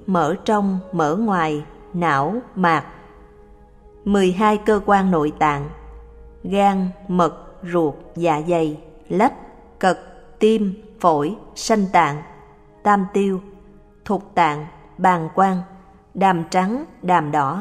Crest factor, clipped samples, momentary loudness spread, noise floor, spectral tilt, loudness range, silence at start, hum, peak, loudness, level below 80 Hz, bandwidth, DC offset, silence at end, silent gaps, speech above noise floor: 18 dB; under 0.1%; 12 LU; -46 dBFS; -6.5 dB/octave; 2 LU; 0 s; none; -2 dBFS; -20 LUFS; -46 dBFS; 13 kHz; under 0.1%; 0 s; none; 28 dB